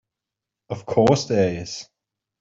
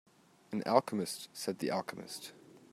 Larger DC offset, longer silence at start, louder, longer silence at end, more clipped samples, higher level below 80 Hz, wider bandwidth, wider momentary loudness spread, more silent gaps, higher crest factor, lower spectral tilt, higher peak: neither; first, 0.7 s vs 0.5 s; first, -20 LUFS vs -36 LUFS; first, 0.55 s vs 0.15 s; neither; first, -54 dBFS vs -84 dBFS; second, 7.8 kHz vs 16 kHz; about the same, 16 LU vs 15 LU; neither; second, 20 dB vs 26 dB; first, -6 dB/octave vs -4.5 dB/octave; first, -4 dBFS vs -10 dBFS